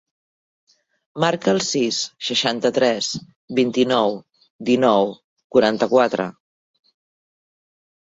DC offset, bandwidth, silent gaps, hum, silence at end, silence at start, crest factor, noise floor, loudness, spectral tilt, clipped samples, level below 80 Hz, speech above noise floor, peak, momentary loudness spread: under 0.1%; 8 kHz; 3.36-3.48 s, 4.50-4.59 s, 5.24-5.36 s, 5.44-5.50 s; none; 1.9 s; 1.15 s; 18 dB; under -90 dBFS; -20 LUFS; -4 dB/octave; under 0.1%; -64 dBFS; over 71 dB; -2 dBFS; 9 LU